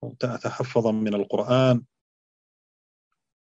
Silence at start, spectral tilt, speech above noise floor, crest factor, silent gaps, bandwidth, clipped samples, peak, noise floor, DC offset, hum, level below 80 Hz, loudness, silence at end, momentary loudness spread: 0 s; -7.5 dB/octave; over 67 dB; 20 dB; none; 7.8 kHz; under 0.1%; -8 dBFS; under -90 dBFS; under 0.1%; none; -68 dBFS; -24 LUFS; 1.6 s; 9 LU